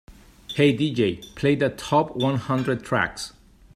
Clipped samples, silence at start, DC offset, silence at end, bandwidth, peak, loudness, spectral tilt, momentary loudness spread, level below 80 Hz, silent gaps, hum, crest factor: under 0.1%; 0.1 s; under 0.1%; 0.45 s; 15 kHz; -6 dBFS; -23 LUFS; -6 dB/octave; 7 LU; -52 dBFS; none; none; 16 dB